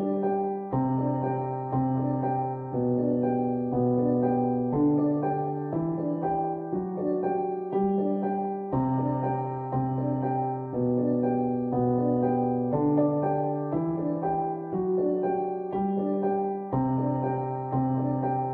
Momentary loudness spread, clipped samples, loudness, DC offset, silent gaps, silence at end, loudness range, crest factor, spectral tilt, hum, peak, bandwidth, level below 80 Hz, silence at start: 5 LU; under 0.1%; -27 LUFS; under 0.1%; none; 0 s; 2 LU; 16 dB; -13.5 dB/octave; none; -12 dBFS; 3.4 kHz; -58 dBFS; 0 s